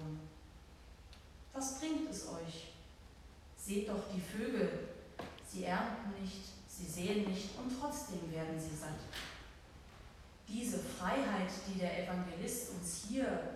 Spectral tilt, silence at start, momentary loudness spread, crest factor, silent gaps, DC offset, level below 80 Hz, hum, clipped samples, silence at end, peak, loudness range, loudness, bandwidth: -4.5 dB/octave; 0 s; 20 LU; 18 dB; none; under 0.1%; -60 dBFS; none; under 0.1%; 0 s; -24 dBFS; 5 LU; -41 LUFS; 15.5 kHz